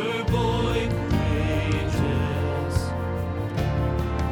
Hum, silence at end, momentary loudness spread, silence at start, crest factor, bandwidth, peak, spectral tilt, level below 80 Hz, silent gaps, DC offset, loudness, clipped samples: none; 0 s; 5 LU; 0 s; 14 dB; 18 kHz; -10 dBFS; -7 dB/octave; -34 dBFS; none; under 0.1%; -25 LUFS; under 0.1%